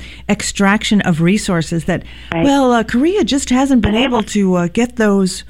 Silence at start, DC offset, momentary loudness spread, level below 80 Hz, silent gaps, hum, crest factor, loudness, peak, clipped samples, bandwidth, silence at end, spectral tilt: 0 s; under 0.1%; 6 LU; -34 dBFS; none; none; 12 dB; -14 LUFS; -2 dBFS; under 0.1%; 15 kHz; 0 s; -5 dB/octave